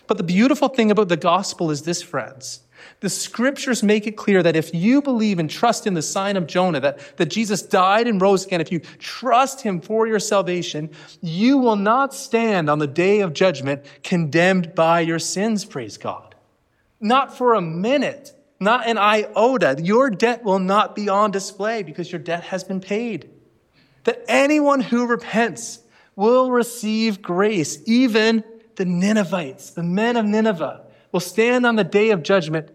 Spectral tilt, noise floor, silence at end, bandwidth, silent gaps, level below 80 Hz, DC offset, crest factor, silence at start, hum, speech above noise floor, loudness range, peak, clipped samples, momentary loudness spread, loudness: -5 dB/octave; -64 dBFS; 0.1 s; 15 kHz; none; -70 dBFS; under 0.1%; 16 dB; 0.1 s; none; 45 dB; 3 LU; -4 dBFS; under 0.1%; 11 LU; -19 LUFS